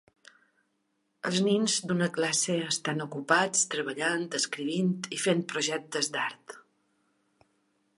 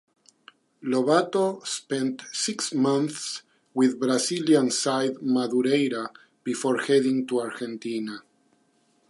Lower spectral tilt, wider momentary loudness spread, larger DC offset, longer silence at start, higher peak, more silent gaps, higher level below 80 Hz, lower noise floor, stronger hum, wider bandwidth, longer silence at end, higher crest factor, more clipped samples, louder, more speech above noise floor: about the same, -3 dB/octave vs -4 dB/octave; second, 7 LU vs 12 LU; neither; first, 1.25 s vs 0.8 s; second, -10 dBFS vs -6 dBFS; neither; about the same, -78 dBFS vs -80 dBFS; first, -76 dBFS vs -66 dBFS; neither; about the same, 11.5 kHz vs 11.5 kHz; first, 1.35 s vs 0.9 s; about the same, 22 dB vs 20 dB; neither; second, -28 LUFS vs -25 LUFS; first, 47 dB vs 42 dB